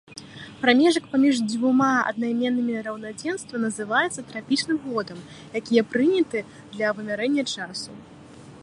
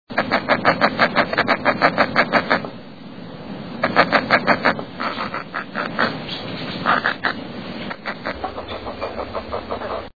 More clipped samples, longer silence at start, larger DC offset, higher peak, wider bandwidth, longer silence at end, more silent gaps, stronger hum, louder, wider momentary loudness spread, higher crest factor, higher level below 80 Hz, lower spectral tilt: neither; about the same, 0.1 s vs 0.05 s; second, under 0.1% vs 0.6%; second, -4 dBFS vs 0 dBFS; first, 11 kHz vs 5.4 kHz; about the same, 0 s vs 0 s; neither; neither; second, -23 LUFS vs -20 LUFS; about the same, 14 LU vs 14 LU; about the same, 20 dB vs 22 dB; second, -66 dBFS vs -48 dBFS; second, -4 dB/octave vs -6 dB/octave